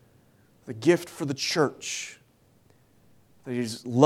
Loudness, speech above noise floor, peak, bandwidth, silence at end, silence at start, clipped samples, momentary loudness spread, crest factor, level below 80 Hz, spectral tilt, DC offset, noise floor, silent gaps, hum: -28 LUFS; 36 dB; -2 dBFS; 15.5 kHz; 0 s; 0.65 s; under 0.1%; 17 LU; 26 dB; -72 dBFS; -5 dB/octave; under 0.1%; -61 dBFS; none; none